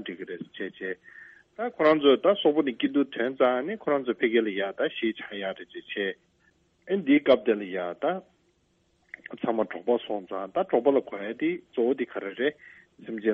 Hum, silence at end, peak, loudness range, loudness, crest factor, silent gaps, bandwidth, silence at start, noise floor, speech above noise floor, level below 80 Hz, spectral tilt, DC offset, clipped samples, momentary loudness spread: none; 0 s; -8 dBFS; 5 LU; -27 LUFS; 20 dB; none; 5.4 kHz; 0 s; -69 dBFS; 42 dB; -72 dBFS; -7.5 dB/octave; under 0.1%; under 0.1%; 16 LU